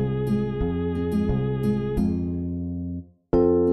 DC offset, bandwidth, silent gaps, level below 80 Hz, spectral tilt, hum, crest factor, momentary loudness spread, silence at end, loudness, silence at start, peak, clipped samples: 0.4%; 12 kHz; none; -38 dBFS; -9.5 dB/octave; none; 14 dB; 9 LU; 0 s; -25 LUFS; 0 s; -10 dBFS; under 0.1%